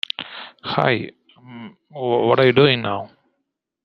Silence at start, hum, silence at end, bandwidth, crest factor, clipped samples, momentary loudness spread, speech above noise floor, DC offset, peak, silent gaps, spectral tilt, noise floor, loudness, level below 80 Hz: 0.2 s; none; 0.8 s; 6 kHz; 20 dB; under 0.1%; 24 LU; 59 dB; under 0.1%; -2 dBFS; none; -8 dB/octave; -77 dBFS; -19 LUFS; -62 dBFS